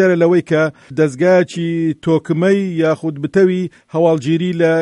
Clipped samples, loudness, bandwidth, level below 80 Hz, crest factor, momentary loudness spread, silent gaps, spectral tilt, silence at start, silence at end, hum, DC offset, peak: under 0.1%; -15 LUFS; 11 kHz; -58 dBFS; 14 dB; 6 LU; none; -7.5 dB/octave; 0 s; 0 s; none; under 0.1%; -2 dBFS